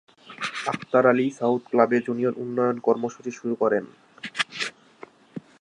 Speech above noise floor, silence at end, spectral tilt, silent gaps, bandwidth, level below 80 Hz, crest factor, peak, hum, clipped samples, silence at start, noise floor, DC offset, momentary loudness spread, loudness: 26 dB; 0.2 s; -5 dB/octave; none; 11 kHz; -76 dBFS; 20 dB; -4 dBFS; none; under 0.1%; 0.25 s; -49 dBFS; under 0.1%; 15 LU; -24 LUFS